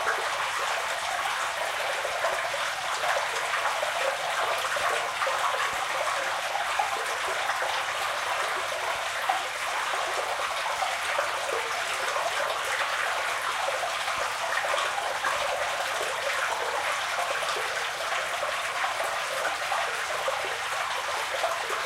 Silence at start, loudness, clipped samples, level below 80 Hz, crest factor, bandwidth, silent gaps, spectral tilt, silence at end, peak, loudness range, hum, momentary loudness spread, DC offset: 0 s; -28 LUFS; under 0.1%; -64 dBFS; 18 dB; 16 kHz; none; 0.5 dB/octave; 0 s; -12 dBFS; 1 LU; none; 2 LU; under 0.1%